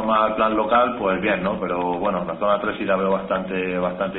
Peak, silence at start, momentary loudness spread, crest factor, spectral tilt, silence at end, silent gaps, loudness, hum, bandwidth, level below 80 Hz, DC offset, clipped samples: -4 dBFS; 0 s; 6 LU; 16 dB; -10.5 dB/octave; 0 s; none; -21 LUFS; none; 4.1 kHz; -50 dBFS; under 0.1%; under 0.1%